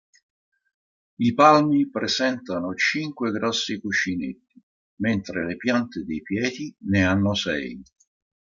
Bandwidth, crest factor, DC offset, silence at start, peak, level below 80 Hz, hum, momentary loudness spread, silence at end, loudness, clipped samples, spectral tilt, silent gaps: 7.6 kHz; 22 dB; under 0.1%; 1.2 s; -2 dBFS; -60 dBFS; none; 12 LU; 0.6 s; -23 LUFS; under 0.1%; -5 dB/octave; 4.63-4.97 s